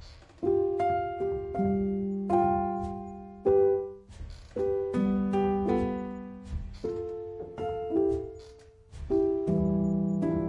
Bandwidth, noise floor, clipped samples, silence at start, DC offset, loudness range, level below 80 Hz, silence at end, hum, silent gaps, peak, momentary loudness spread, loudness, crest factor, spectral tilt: 7.6 kHz; -52 dBFS; under 0.1%; 0 s; under 0.1%; 4 LU; -48 dBFS; 0 s; none; none; -12 dBFS; 14 LU; -29 LUFS; 16 dB; -9.5 dB/octave